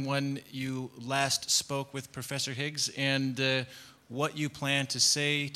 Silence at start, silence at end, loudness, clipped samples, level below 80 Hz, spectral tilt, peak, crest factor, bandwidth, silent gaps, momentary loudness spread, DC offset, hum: 0 s; 0 s; -30 LUFS; under 0.1%; -70 dBFS; -3 dB/octave; -12 dBFS; 20 dB; 16 kHz; none; 13 LU; under 0.1%; none